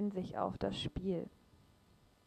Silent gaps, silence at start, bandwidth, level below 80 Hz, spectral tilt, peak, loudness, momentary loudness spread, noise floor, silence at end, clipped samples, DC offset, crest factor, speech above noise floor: none; 0 s; 9.8 kHz; -58 dBFS; -7 dB/octave; -22 dBFS; -40 LUFS; 4 LU; -68 dBFS; 0.95 s; under 0.1%; under 0.1%; 20 dB; 29 dB